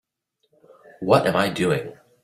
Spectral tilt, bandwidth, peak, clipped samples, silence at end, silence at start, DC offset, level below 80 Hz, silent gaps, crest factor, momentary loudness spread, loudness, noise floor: -5.5 dB/octave; 15.5 kHz; -2 dBFS; under 0.1%; 0.3 s; 1 s; under 0.1%; -60 dBFS; none; 22 dB; 13 LU; -21 LUFS; -73 dBFS